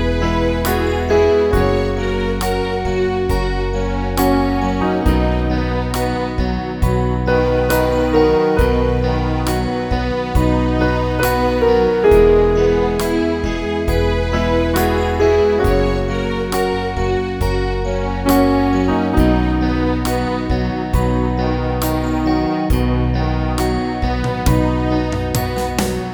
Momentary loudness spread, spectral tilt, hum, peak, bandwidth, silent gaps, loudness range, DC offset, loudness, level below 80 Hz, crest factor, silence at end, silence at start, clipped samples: 6 LU; -6.5 dB/octave; none; 0 dBFS; over 20 kHz; none; 3 LU; 0.2%; -17 LUFS; -24 dBFS; 16 dB; 0 s; 0 s; under 0.1%